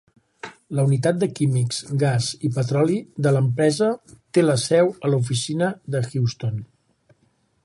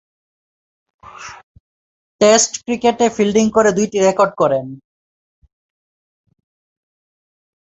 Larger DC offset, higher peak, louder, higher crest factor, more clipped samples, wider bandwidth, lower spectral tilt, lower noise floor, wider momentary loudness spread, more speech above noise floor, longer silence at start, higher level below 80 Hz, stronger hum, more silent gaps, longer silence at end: neither; second, -4 dBFS vs 0 dBFS; second, -22 LUFS vs -15 LUFS; about the same, 16 dB vs 18 dB; neither; first, 11.5 kHz vs 8.4 kHz; first, -6 dB/octave vs -3.5 dB/octave; second, -65 dBFS vs under -90 dBFS; second, 10 LU vs 22 LU; second, 44 dB vs over 76 dB; second, 0.45 s vs 1.2 s; about the same, -60 dBFS vs -56 dBFS; neither; second, none vs 1.43-2.19 s; second, 1 s vs 3 s